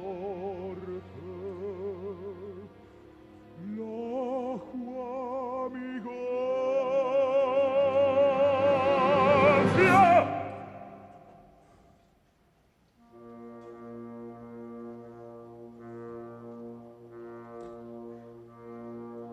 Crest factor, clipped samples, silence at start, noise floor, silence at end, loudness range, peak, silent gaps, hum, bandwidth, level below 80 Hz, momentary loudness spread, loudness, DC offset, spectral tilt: 20 dB; under 0.1%; 0 s; -66 dBFS; 0 s; 23 LU; -10 dBFS; none; none; 12 kHz; -64 dBFS; 25 LU; -27 LUFS; under 0.1%; -7 dB/octave